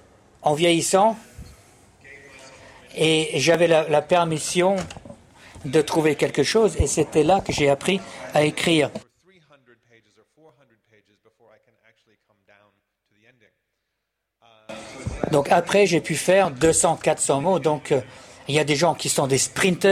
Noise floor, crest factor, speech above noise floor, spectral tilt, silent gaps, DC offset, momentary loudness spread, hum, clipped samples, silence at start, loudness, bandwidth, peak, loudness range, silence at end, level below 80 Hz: -79 dBFS; 18 dB; 59 dB; -4 dB/octave; none; under 0.1%; 15 LU; none; under 0.1%; 0.4 s; -20 LUFS; 16 kHz; -6 dBFS; 6 LU; 0 s; -46 dBFS